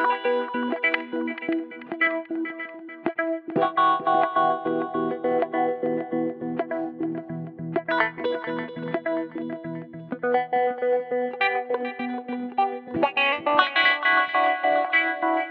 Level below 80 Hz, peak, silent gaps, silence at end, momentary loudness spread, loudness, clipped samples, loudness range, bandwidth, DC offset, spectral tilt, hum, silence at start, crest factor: -74 dBFS; -2 dBFS; none; 0 s; 11 LU; -24 LUFS; under 0.1%; 6 LU; 5.8 kHz; under 0.1%; -7.5 dB/octave; none; 0 s; 22 dB